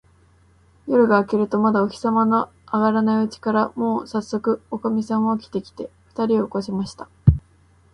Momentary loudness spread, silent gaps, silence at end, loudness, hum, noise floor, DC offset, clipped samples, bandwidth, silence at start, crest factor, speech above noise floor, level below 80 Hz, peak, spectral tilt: 11 LU; none; 0.55 s; -21 LUFS; none; -55 dBFS; under 0.1%; under 0.1%; 9.8 kHz; 0.85 s; 20 dB; 35 dB; -38 dBFS; 0 dBFS; -8 dB/octave